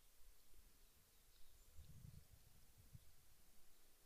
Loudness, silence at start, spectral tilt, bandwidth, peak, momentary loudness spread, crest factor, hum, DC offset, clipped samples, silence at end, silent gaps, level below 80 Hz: -66 LUFS; 0 s; -4 dB/octave; 15.5 kHz; -48 dBFS; 4 LU; 16 dB; none; under 0.1%; under 0.1%; 0 s; none; -70 dBFS